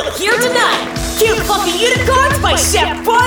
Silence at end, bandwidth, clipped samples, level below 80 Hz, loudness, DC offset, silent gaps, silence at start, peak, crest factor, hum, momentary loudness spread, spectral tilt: 0 s; over 20 kHz; under 0.1%; -28 dBFS; -13 LUFS; under 0.1%; none; 0 s; 0 dBFS; 14 dB; none; 3 LU; -3 dB/octave